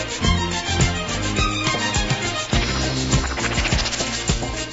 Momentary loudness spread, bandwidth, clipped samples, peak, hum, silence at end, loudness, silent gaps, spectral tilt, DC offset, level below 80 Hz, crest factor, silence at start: 2 LU; 8 kHz; under 0.1%; -4 dBFS; none; 0 s; -21 LUFS; none; -3.5 dB/octave; under 0.1%; -28 dBFS; 16 dB; 0 s